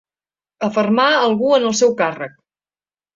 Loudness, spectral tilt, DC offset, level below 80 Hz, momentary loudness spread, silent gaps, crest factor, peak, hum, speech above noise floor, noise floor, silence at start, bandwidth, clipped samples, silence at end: -16 LUFS; -3.5 dB/octave; under 0.1%; -62 dBFS; 11 LU; none; 16 dB; -2 dBFS; 50 Hz at -45 dBFS; over 74 dB; under -90 dBFS; 0.6 s; 7.8 kHz; under 0.1%; 0.85 s